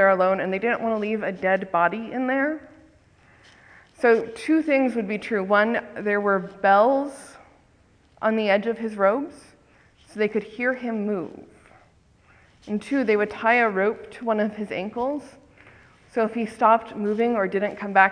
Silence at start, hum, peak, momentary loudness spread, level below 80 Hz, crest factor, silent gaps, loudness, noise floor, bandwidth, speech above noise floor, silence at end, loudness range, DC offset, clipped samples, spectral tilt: 0 s; none; -2 dBFS; 10 LU; -64 dBFS; 22 dB; none; -23 LUFS; -58 dBFS; 10.5 kHz; 36 dB; 0 s; 5 LU; under 0.1%; under 0.1%; -6.5 dB/octave